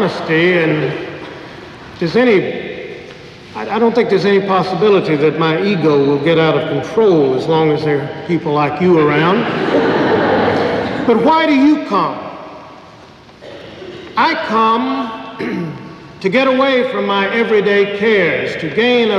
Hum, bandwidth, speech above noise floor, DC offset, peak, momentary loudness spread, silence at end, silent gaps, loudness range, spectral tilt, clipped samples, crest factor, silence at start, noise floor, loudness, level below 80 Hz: none; 9.6 kHz; 26 dB; under 0.1%; -2 dBFS; 19 LU; 0 s; none; 5 LU; -7 dB/octave; under 0.1%; 12 dB; 0 s; -39 dBFS; -14 LUFS; -52 dBFS